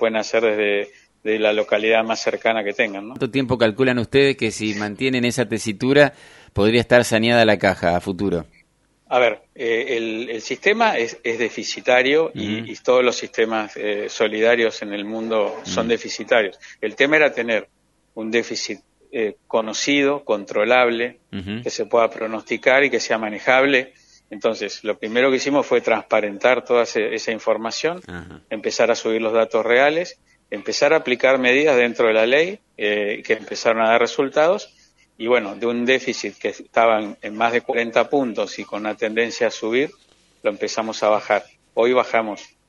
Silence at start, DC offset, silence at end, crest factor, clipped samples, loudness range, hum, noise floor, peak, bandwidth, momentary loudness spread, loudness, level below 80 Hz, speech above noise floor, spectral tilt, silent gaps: 0 s; under 0.1%; 0.25 s; 20 dB; under 0.1%; 4 LU; none; -60 dBFS; 0 dBFS; 11.5 kHz; 11 LU; -19 LUFS; -56 dBFS; 40 dB; -4 dB/octave; none